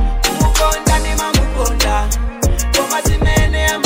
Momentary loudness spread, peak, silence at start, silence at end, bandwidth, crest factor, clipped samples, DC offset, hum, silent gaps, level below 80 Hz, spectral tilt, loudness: 4 LU; 0 dBFS; 0 s; 0 s; 16.5 kHz; 14 dB; under 0.1%; under 0.1%; none; none; -16 dBFS; -3.5 dB/octave; -15 LUFS